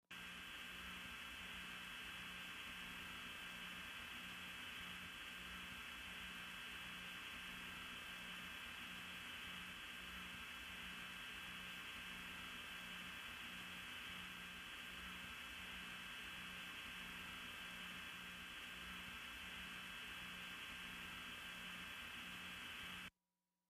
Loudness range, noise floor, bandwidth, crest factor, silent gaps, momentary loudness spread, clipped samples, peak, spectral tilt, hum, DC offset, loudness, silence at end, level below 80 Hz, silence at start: 0 LU; under -90 dBFS; 15.5 kHz; 14 dB; none; 1 LU; under 0.1%; -40 dBFS; -2 dB/octave; 60 Hz at -75 dBFS; under 0.1%; -50 LUFS; 0.6 s; -70 dBFS; 0.1 s